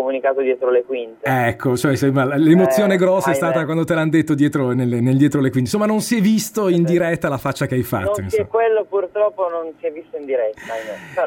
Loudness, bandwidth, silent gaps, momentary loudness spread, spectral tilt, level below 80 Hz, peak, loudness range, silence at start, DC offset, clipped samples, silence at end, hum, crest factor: -18 LUFS; 17 kHz; none; 9 LU; -6.5 dB/octave; -56 dBFS; -2 dBFS; 4 LU; 0 s; under 0.1%; under 0.1%; 0 s; none; 16 dB